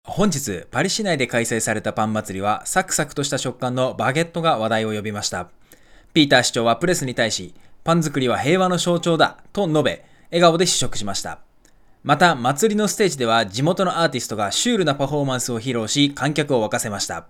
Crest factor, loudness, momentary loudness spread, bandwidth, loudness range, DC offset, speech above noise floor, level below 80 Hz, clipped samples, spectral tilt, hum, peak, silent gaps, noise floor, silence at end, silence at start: 20 dB; -20 LUFS; 9 LU; 18 kHz; 3 LU; under 0.1%; 31 dB; -48 dBFS; under 0.1%; -4 dB/octave; none; 0 dBFS; none; -51 dBFS; 0.05 s; 0.05 s